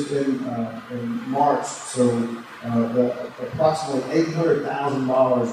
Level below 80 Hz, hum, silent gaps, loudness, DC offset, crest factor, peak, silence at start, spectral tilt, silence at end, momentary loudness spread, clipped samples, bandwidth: -64 dBFS; none; none; -23 LUFS; under 0.1%; 16 dB; -6 dBFS; 0 s; -6 dB/octave; 0 s; 9 LU; under 0.1%; 14 kHz